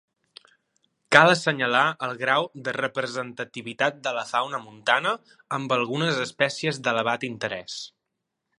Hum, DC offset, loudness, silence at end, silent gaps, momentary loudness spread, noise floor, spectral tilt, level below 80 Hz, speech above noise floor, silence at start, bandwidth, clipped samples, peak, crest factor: none; under 0.1%; -24 LUFS; 0.7 s; none; 14 LU; -81 dBFS; -4 dB/octave; -72 dBFS; 57 dB; 1.1 s; 11.5 kHz; under 0.1%; 0 dBFS; 26 dB